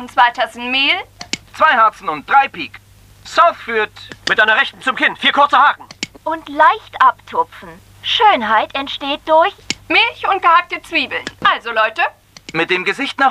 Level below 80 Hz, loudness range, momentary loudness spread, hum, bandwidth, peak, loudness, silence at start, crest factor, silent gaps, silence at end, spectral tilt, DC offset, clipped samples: -52 dBFS; 2 LU; 13 LU; none; 15 kHz; 0 dBFS; -15 LUFS; 0 s; 16 dB; none; 0 s; -2.5 dB/octave; under 0.1%; under 0.1%